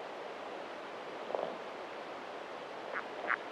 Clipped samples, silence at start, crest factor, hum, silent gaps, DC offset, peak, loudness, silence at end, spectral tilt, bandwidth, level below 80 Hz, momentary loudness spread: under 0.1%; 0 s; 26 dB; none; none; under 0.1%; -16 dBFS; -42 LUFS; 0 s; -3.5 dB/octave; 13 kHz; -84 dBFS; 6 LU